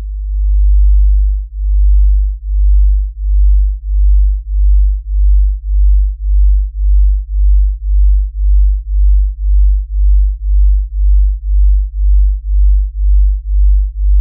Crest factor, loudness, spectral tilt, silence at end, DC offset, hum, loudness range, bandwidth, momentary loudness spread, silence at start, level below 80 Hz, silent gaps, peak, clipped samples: 6 dB; -14 LUFS; -26 dB/octave; 0 s; under 0.1%; none; 0 LU; 0.1 kHz; 4 LU; 0 s; -10 dBFS; none; -4 dBFS; under 0.1%